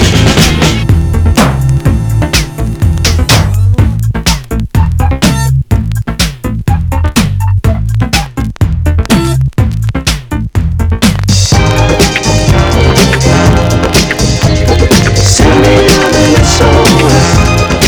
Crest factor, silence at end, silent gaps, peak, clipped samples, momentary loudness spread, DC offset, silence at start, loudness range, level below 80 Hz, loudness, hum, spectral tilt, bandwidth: 8 dB; 0 s; none; 0 dBFS; 2%; 7 LU; under 0.1%; 0 s; 5 LU; -16 dBFS; -9 LUFS; none; -5 dB/octave; over 20 kHz